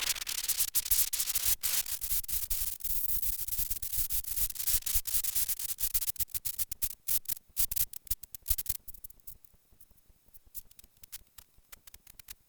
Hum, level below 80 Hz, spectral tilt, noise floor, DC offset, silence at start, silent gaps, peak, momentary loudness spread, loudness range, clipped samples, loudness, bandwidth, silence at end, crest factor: none; -48 dBFS; 1 dB/octave; -62 dBFS; under 0.1%; 0 s; none; -12 dBFS; 19 LU; 11 LU; under 0.1%; -30 LUFS; over 20 kHz; 0.15 s; 22 dB